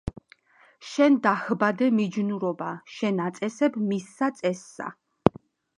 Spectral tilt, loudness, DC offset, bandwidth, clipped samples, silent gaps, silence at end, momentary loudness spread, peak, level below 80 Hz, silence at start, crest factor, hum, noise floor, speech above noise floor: -6.5 dB/octave; -25 LUFS; under 0.1%; 11 kHz; under 0.1%; none; 0.5 s; 14 LU; 0 dBFS; -54 dBFS; 0.05 s; 26 dB; none; -58 dBFS; 33 dB